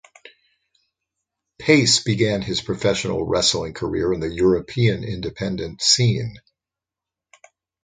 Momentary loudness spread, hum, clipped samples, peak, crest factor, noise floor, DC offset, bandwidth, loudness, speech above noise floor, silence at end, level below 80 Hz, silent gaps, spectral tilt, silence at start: 11 LU; none; under 0.1%; -2 dBFS; 20 dB; -88 dBFS; under 0.1%; 9.6 kHz; -20 LUFS; 68 dB; 1.45 s; -46 dBFS; none; -4 dB/octave; 1.6 s